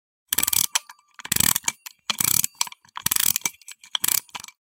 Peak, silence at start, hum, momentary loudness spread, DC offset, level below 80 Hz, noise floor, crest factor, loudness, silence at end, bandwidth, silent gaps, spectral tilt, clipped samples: -2 dBFS; 0.3 s; none; 11 LU; under 0.1%; -56 dBFS; -44 dBFS; 24 dB; -22 LUFS; 0.3 s; 18 kHz; none; 0.5 dB/octave; under 0.1%